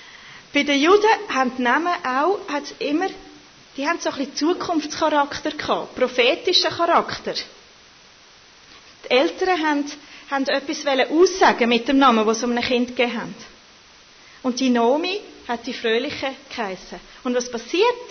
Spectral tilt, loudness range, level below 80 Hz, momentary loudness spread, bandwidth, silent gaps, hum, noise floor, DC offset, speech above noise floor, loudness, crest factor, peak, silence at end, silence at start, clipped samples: -3 dB/octave; 5 LU; -58 dBFS; 14 LU; 6.6 kHz; none; none; -49 dBFS; under 0.1%; 29 dB; -20 LUFS; 18 dB; -4 dBFS; 0 s; 0 s; under 0.1%